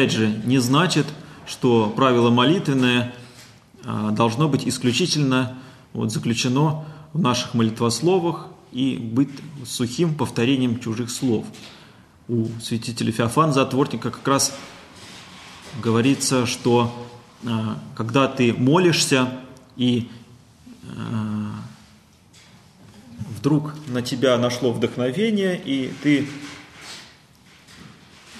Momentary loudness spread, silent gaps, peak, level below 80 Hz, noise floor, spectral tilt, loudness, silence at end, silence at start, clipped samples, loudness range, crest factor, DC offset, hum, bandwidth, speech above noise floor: 20 LU; none; -4 dBFS; -60 dBFS; -52 dBFS; -5 dB/octave; -21 LUFS; 0 s; 0 s; under 0.1%; 6 LU; 18 dB; under 0.1%; none; 13 kHz; 31 dB